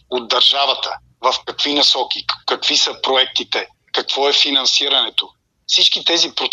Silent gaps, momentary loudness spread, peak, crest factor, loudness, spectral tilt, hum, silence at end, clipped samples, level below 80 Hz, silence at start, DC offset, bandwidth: none; 10 LU; 0 dBFS; 18 dB; -15 LUFS; 0 dB/octave; none; 0 s; under 0.1%; -64 dBFS; 0.1 s; under 0.1%; 12 kHz